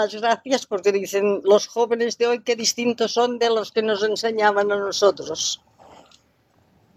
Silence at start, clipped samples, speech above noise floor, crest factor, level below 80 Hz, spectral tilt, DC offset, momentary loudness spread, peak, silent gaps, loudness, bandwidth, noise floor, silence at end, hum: 0 s; under 0.1%; 40 dB; 18 dB; -70 dBFS; -2.5 dB/octave; under 0.1%; 5 LU; -4 dBFS; none; -21 LUFS; 15.5 kHz; -61 dBFS; 1.4 s; none